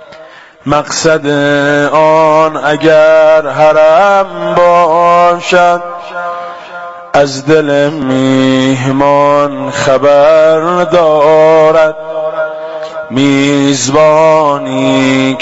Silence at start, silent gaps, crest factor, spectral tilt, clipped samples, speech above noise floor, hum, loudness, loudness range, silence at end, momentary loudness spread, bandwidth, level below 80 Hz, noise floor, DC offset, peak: 0 s; none; 8 dB; -5 dB/octave; under 0.1%; 26 dB; none; -8 LUFS; 4 LU; 0 s; 12 LU; 8 kHz; -46 dBFS; -34 dBFS; under 0.1%; 0 dBFS